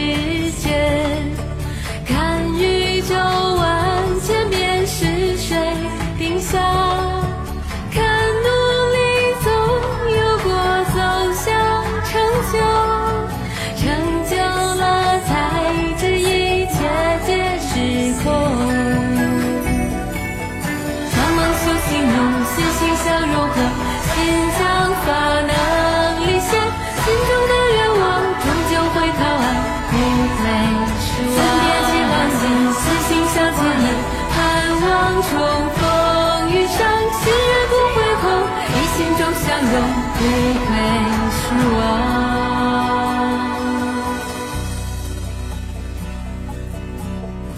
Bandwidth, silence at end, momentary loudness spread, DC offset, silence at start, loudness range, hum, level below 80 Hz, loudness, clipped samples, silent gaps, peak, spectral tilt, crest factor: 15.5 kHz; 0 s; 8 LU; under 0.1%; 0 s; 3 LU; none; -30 dBFS; -17 LUFS; under 0.1%; none; -4 dBFS; -4.5 dB/octave; 14 dB